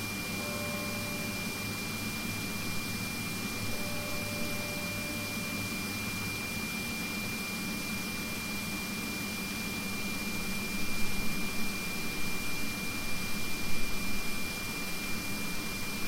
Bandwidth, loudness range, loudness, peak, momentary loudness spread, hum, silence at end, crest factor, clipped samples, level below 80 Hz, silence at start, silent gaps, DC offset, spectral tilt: 16 kHz; 1 LU; -34 LUFS; -16 dBFS; 1 LU; none; 0 s; 16 dB; under 0.1%; -46 dBFS; 0 s; none; under 0.1%; -3 dB/octave